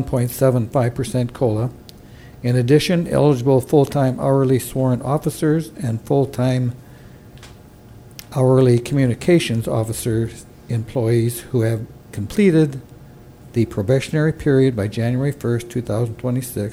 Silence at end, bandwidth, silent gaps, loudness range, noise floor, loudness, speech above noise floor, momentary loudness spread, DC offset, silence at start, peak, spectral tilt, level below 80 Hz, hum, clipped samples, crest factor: 0 s; 15.5 kHz; none; 3 LU; -42 dBFS; -19 LUFS; 24 dB; 11 LU; under 0.1%; 0 s; -2 dBFS; -7 dB/octave; -44 dBFS; none; under 0.1%; 16 dB